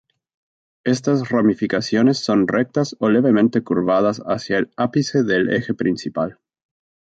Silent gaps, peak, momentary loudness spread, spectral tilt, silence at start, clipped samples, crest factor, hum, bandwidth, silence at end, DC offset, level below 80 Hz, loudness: none; -4 dBFS; 6 LU; -6 dB/octave; 0.85 s; under 0.1%; 14 dB; none; 8 kHz; 0.9 s; under 0.1%; -58 dBFS; -19 LUFS